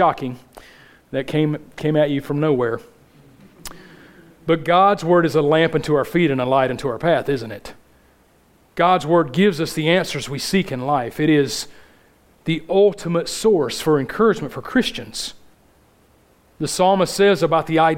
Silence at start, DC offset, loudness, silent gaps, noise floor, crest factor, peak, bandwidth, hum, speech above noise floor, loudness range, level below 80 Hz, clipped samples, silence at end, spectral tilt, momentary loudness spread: 0 s; under 0.1%; -19 LUFS; none; -55 dBFS; 18 dB; -2 dBFS; 16.5 kHz; none; 37 dB; 5 LU; -50 dBFS; under 0.1%; 0 s; -5.5 dB/octave; 13 LU